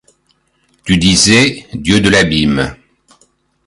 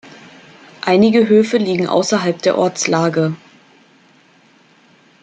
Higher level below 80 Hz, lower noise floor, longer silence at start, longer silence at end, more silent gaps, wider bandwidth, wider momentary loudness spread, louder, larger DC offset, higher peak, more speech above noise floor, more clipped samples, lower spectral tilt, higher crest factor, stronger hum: first, -34 dBFS vs -62 dBFS; first, -59 dBFS vs -51 dBFS; first, 0.85 s vs 0.05 s; second, 0.95 s vs 1.85 s; neither; first, 11.5 kHz vs 9.2 kHz; first, 13 LU vs 8 LU; first, -11 LUFS vs -15 LUFS; neither; about the same, 0 dBFS vs -2 dBFS; first, 48 dB vs 37 dB; neither; second, -3.5 dB/octave vs -5 dB/octave; about the same, 14 dB vs 16 dB; neither